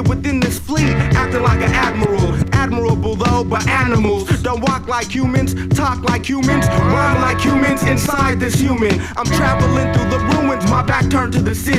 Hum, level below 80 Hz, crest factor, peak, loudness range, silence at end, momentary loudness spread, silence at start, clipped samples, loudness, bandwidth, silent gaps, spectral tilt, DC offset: none; -28 dBFS; 14 dB; 0 dBFS; 1 LU; 0 s; 4 LU; 0 s; under 0.1%; -16 LUFS; 15.5 kHz; none; -6 dB/octave; under 0.1%